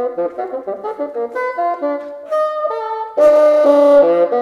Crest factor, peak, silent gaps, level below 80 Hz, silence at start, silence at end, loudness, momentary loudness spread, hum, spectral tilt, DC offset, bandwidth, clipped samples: 14 dB; -2 dBFS; none; -60 dBFS; 0 s; 0 s; -15 LUFS; 14 LU; none; -5.5 dB/octave; under 0.1%; 7 kHz; under 0.1%